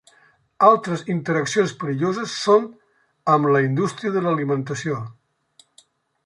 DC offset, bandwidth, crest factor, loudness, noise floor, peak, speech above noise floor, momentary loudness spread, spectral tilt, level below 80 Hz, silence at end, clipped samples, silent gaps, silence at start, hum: under 0.1%; 11.5 kHz; 20 dB; -21 LUFS; -58 dBFS; -2 dBFS; 38 dB; 11 LU; -6 dB/octave; -68 dBFS; 1.15 s; under 0.1%; none; 0.6 s; none